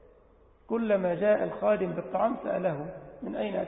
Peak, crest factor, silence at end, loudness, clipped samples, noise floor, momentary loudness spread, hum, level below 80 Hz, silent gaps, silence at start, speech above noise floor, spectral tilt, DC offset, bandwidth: -14 dBFS; 16 dB; 0 s; -29 LUFS; under 0.1%; -59 dBFS; 12 LU; none; -62 dBFS; none; 0.7 s; 30 dB; -11 dB/octave; under 0.1%; 4 kHz